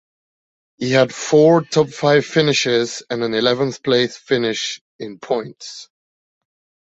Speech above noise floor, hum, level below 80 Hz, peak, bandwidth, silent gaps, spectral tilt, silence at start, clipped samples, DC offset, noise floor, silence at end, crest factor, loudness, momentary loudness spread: over 73 dB; none; -60 dBFS; -2 dBFS; 8.2 kHz; 4.81-4.99 s; -4.5 dB/octave; 0.8 s; under 0.1%; under 0.1%; under -90 dBFS; 1.1 s; 18 dB; -17 LUFS; 18 LU